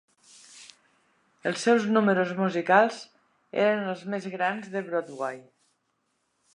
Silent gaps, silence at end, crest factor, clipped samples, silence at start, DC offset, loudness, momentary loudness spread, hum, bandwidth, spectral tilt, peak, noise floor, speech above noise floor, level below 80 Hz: none; 1.15 s; 22 dB; under 0.1%; 0.55 s; under 0.1%; -26 LUFS; 13 LU; none; 11 kHz; -5.5 dB/octave; -6 dBFS; -75 dBFS; 49 dB; -80 dBFS